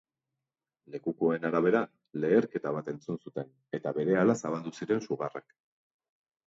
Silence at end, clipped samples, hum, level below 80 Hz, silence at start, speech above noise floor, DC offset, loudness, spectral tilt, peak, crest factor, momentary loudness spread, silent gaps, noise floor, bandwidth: 1.05 s; under 0.1%; none; -74 dBFS; 0.9 s; 60 dB; under 0.1%; -31 LUFS; -7 dB/octave; -12 dBFS; 20 dB; 12 LU; none; -90 dBFS; 7.8 kHz